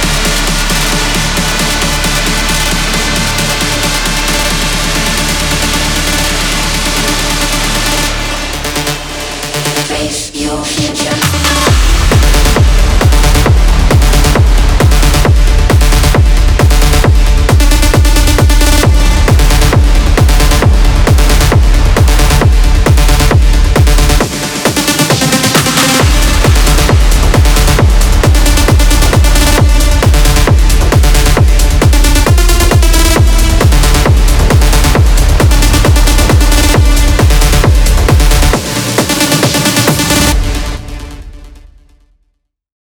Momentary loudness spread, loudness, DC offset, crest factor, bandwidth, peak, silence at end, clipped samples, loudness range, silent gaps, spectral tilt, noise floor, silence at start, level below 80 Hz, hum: 4 LU; -9 LUFS; under 0.1%; 8 dB; 19.5 kHz; 0 dBFS; 1.45 s; 0.3%; 3 LU; none; -4 dB/octave; -62 dBFS; 0 s; -10 dBFS; none